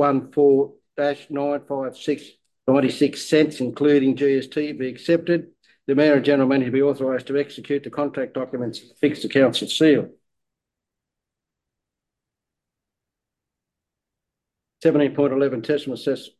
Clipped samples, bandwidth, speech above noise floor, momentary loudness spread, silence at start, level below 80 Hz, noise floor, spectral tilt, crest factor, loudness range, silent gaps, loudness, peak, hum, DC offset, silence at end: under 0.1%; 12.5 kHz; 65 dB; 10 LU; 0 s; -68 dBFS; -85 dBFS; -6 dB/octave; 18 dB; 5 LU; none; -21 LUFS; -4 dBFS; none; under 0.1%; 0.1 s